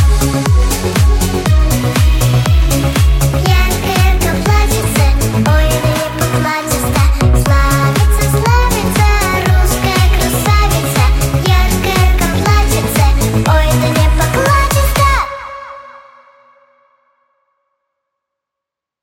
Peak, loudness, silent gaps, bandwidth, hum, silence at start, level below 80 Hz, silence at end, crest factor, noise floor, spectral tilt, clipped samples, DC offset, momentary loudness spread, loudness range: 0 dBFS; -12 LUFS; none; 17 kHz; none; 0 s; -14 dBFS; 3.05 s; 10 dB; -82 dBFS; -5 dB/octave; under 0.1%; under 0.1%; 3 LU; 2 LU